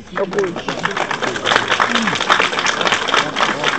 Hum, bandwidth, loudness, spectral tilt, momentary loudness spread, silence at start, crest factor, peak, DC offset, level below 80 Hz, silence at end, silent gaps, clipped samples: none; 14.5 kHz; -16 LUFS; -2.5 dB/octave; 7 LU; 0 s; 18 dB; 0 dBFS; 0.5%; -50 dBFS; 0 s; none; under 0.1%